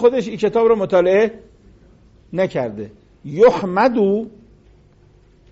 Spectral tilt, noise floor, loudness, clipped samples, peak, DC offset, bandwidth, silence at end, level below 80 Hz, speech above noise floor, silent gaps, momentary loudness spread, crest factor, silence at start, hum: -5.5 dB/octave; -50 dBFS; -17 LUFS; under 0.1%; -2 dBFS; under 0.1%; 7.8 kHz; 1.2 s; -52 dBFS; 34 dB; none; 18 LU; 16 dB; 0 s; none